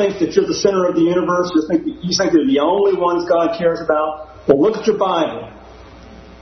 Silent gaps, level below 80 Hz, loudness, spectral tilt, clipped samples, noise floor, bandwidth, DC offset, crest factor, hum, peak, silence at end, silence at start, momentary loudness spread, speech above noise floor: none; -48 dBFS; -16 LUFS; -5 dB/octave; under 0.1%; -39 dBFS; 6.4 kHz; under 0.1%; 16 dB; none; 0 dBFS; 0.05 s; 0 s; 6 LU; 23 dB